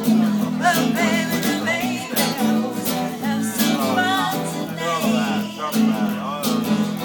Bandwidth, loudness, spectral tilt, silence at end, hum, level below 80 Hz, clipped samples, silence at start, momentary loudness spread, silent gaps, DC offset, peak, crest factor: 20 kHz; -20 LUFS; -4.5 dB/octave; 0 s; none; -60 dBFS; under 0.1%; 0 s; 5 LU; none; under 0.1%; -6 dBFS; 16 dB